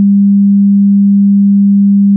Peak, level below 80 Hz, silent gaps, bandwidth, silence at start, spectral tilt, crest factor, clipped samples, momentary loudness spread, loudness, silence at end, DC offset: -4 dBFS; -74 dBFS; none; 0.3 kHz; 0 s; -21.5 dB/octave; 4 dB; under 0.1%; 0 LU; -7 LUFS; 0 s; under 0.1%